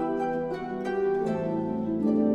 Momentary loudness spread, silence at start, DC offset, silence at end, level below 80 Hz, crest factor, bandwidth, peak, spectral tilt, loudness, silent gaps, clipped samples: 5 LU; 0 s; under 0.1%; 0 s; -56 dBFS; 12 dB; 8.4 kHz; -14 dBFS; -8.5 dB/octave; -28 LUFS; none; under 0.1%